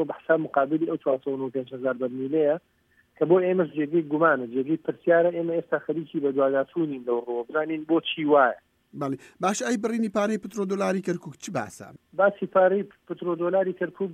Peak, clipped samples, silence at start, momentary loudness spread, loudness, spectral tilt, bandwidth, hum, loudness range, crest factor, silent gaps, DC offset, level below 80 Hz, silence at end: -8 dBFS; under 0.1%; 0 s; 11 LU; -25 LUFS; -5.5 dB/octave; 14 kHz; none; 3 LU; 18 dB; none; under 0.1%; -74 dBFS; 0 s